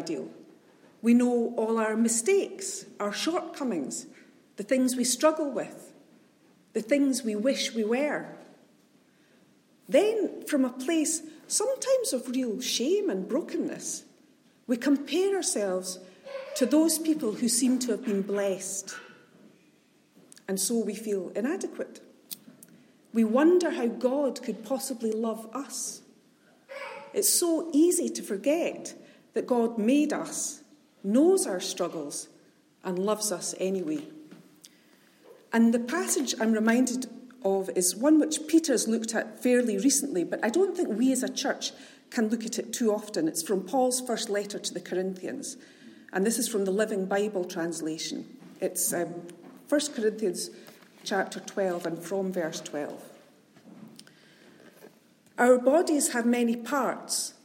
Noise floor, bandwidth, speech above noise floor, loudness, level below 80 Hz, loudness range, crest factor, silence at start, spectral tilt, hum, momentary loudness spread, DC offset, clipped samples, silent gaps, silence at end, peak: -63 dBFS; 16.5 kHz; 36 dB; -28 LUFS; -86 dBFS; 7 LU; 20 dB; 0 s; -3.5 dB/octave; none; 13 LU; under 0.1%; under 0.1%; none; 0.15 s; -10 dBFS